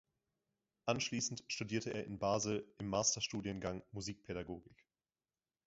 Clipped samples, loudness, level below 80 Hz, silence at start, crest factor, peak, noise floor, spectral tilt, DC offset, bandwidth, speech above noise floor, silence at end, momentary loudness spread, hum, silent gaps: under 0.1%; -40 LUFS; -66 dBFS; 0.85 s; 24 dB; -18 dBFS; under -90 dBFS; -4 dB/octave; under 0.1%; 7.6 kHz; over 50 dB; 0.95 s; 11 LU; none; none